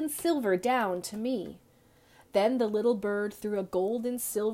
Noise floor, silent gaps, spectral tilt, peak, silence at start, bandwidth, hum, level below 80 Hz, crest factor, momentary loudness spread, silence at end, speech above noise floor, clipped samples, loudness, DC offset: -61 dBFS; none; -4.5 dB/octave; -14 dBFS; 0 s; 16 kHz; none; -68 dBFS; 16 dB; 6 LU; 0 s; 32 dB; under 0.1%; -30 LUFS; under 0.1%